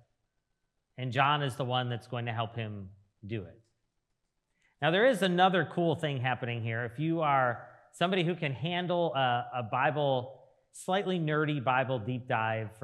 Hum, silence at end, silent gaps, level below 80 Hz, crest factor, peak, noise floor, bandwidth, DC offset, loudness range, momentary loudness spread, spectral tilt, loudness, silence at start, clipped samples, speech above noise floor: none; 0.1 s; none; -78 dBFS; 22 dB; -10 dBFS; -81 dBFS; 13 kHz; under 0.1%; 5 LU; 13 LU; -6 dB/octave; -30 LUFS; 1 s; under 0.1%; 50 dB